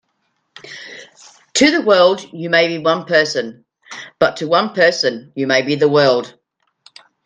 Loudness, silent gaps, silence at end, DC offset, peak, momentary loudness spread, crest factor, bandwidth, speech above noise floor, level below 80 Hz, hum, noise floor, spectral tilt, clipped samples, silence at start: -15 LUFS; none; 0.95 s; under 0.1%; 0 dBFS; 21 LU; 18 dB; 9.6 kHz; 53 dB; -62 dBFS; none; -68 dBFS; -3.5 dB/octave; under 0.1%; 0.65 s